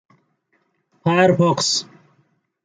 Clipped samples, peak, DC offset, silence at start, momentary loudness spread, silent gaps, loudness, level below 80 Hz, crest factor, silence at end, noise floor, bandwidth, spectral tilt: under 0.1%; -2 dBFS; under 0.1%; 1.05 s; 8 LU; none; -17 LUFS; -64 dBFS; 18 dB; 0.8 s; -67 dBFS; 9.6 kHz; -4.5 dB/octave